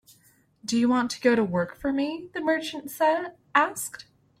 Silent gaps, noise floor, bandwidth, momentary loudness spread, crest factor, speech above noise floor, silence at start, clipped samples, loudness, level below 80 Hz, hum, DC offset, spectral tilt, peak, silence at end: none; -62 dBFS; 16.5 kHz; 11 LU; 22 dB; 36 dB; 0.65 s; under 0.1%; -26 LUFS; -62 dBFS; none; under 0.1%; -4.5 dB/octave; -6 dBFS; 0.4 s